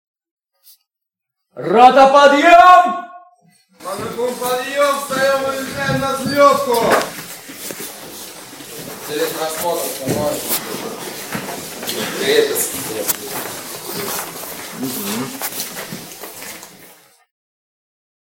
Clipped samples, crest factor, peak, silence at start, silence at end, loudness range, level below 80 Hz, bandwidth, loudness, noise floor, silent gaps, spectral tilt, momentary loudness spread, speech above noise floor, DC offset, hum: 0.2%; 18 dB; 0 dBFS; 1.55 s; 1.45 s; 13 LU; -54 dBFS; 17 kHz; -16 LUFS; -82 dBFS; none; -3 dB/octave; 21 LU; 67 dB; under 0.1%; none